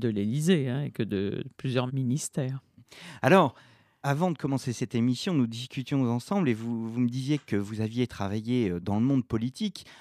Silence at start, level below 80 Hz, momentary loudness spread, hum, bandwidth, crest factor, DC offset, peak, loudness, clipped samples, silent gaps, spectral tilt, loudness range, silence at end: 0 s; -64 dBFS; 8 LU; none; 14.5 kHz; 22 dB; under 0.1%; -6 dBFS; -28 LUFS; under 0.1%; none; -6.5 dB/octave; 2 LU; 0.05 s